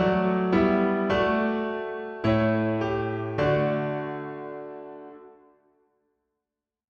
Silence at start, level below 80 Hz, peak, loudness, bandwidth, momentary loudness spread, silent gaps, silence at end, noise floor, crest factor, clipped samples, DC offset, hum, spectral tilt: 0 s; -50 dBFS; -10 dBFS; -25 LUFS; 6.8 kHz; 16 LU; none; 1.6 s; -88 dBFS; 16 dB; under 0.1%; under 0.1%; none; -8.5 dB/octave